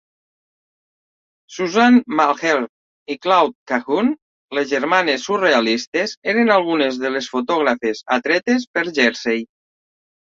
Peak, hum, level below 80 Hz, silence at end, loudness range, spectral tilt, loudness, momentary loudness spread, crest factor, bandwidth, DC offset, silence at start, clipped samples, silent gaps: -2 dBFS; none; -66 dBFS; 0.9 s; 2 LU; -4 dB/octave; -18 LUFS; 9 LU; 18 dB; 7.6 kHz; under 0.1%; 1.5 s; under 0.1%; 2.69-3.06 s, 3.55-3.66 s, 4.22-4.49 s, 5.87-5.92 s, 6.17-6.22 s, 8.67-8.74 s